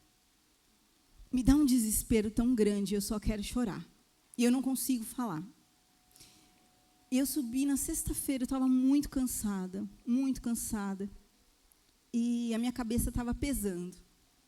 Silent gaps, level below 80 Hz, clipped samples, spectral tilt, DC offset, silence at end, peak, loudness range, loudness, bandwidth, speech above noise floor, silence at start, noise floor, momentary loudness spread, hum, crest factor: none; -48 dBFS; under 0.1%; -5 dB/octave; under 0.1%; 0.45 s; -12 dBFS; 5 LU; -32 LUFS; 16.5 kHz; 38 dB; 1.2 s; -69 dBFS; 11 LU; none; 22 dB